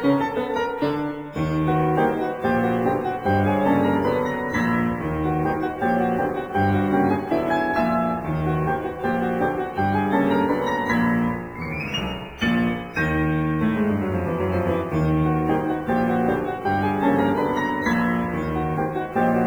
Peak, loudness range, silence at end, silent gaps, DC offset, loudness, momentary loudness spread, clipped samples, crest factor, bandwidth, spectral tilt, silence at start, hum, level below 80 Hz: -8 dBFS; 1 LU; 0 s; none; under 0.1%; -22 LUFS; 5 LU; under 0.1%; 14 dB; over 20 kHz; -7.5 dB/octave; 0 s; none; -42 dBFS